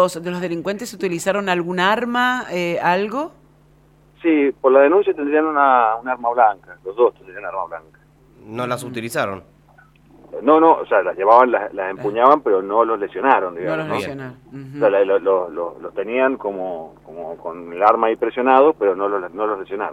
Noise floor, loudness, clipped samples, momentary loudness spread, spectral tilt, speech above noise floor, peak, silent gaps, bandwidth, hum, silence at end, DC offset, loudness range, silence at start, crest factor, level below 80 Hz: -52 dBFS; -18 LUFS; under 0.1%; 17 LU; -5.5 dB/octave; 34 dB; 0 dBFS; none; 15.5 kHz; none; 0 s; under 0.1%; 6 LU; 0 s; 18 dB; -60 dBFS